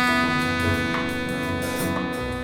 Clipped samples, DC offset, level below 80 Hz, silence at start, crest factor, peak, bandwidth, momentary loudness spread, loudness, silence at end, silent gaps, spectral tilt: under 0.1%; under 0.1%; -42 dBFS; 0 s; 16 dB; -8 dBFS; 18 kHz; 6 LU; -24 LUFS; 0 s; none; -5 dB/octave